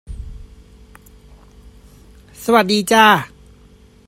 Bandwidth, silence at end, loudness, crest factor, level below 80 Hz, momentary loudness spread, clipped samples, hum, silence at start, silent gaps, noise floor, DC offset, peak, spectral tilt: 16 kHz; 0.8 s; -14 LUFS; 20 dB; -40 dBFS; 24 LU; under 0.1%; none; 0.1 s; none; -47 dBFS; under 0.1%; 0 dBFS; -3.5 dB/octave